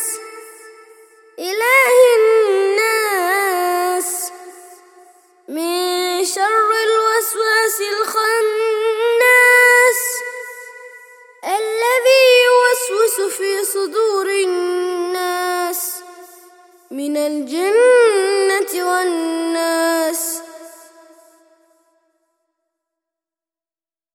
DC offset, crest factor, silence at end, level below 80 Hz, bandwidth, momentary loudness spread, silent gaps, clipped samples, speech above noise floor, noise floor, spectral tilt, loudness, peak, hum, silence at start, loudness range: under 0.1%; 16 dB; 3.45 s; -76 dBFS; 18.5 kHz; 14 LU; none; under 0.1%; over 75 dB; under -90 dBFS; 1 dB/octave; -15 LUFS; 0 dBFS; none; 0 s; 8 LU